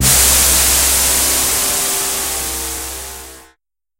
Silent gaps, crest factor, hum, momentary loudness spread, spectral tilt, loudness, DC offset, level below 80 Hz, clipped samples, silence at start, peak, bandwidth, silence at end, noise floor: none; 16 dB; none; 16 LU; -0.5 dB/octave; -12 LUFS; under 0.1%; -28 dBFS; under 0.1%; 0 s; 0 dBFS; 16.5 kHz; 0.6 s; -59 dBFS